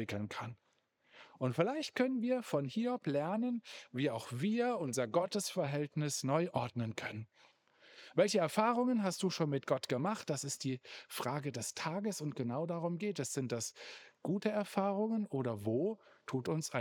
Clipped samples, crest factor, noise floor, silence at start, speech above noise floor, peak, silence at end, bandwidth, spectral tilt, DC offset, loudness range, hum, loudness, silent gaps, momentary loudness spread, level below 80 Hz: under 0.1%; 22 dB; -74 dBFS; 0 s; 37 dB; -16 dBFS; 0 s; over 20 kHz; -5 dB/octave; under 0.1%; 4 LU; none; -37 LUFS; none; 10 LU; -86 dBFS